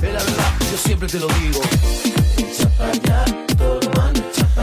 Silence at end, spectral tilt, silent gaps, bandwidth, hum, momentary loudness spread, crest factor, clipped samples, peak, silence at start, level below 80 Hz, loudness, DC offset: 0 s; -5 dB/octave; none; 16 kHz; none; 2 LU; 12 dB; under 0.1%; -4 dBFS; 0 s; -20 dBFS; -18 LUFS; under 0.1%